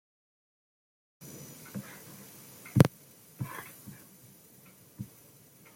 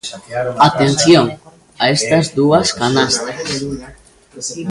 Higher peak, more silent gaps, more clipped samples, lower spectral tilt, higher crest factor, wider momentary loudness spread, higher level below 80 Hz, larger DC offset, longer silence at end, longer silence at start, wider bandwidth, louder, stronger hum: second, -4 dBFS vs 0 dBFS; neither; neither; first, -6.5 dB/octave vs -4 dB/octave; first, 32 dB vs 16 dB; first, 29 LU vs 14 LU; second, -60 dBFS vs -46 dBFS; neither; first, 0.7 s vs 0 s; first, 1.2 s vs 0.05 s; first, 16.5 kHz vs 11.5 kHz; second, -31 LUFS vs -14 LUFS; neither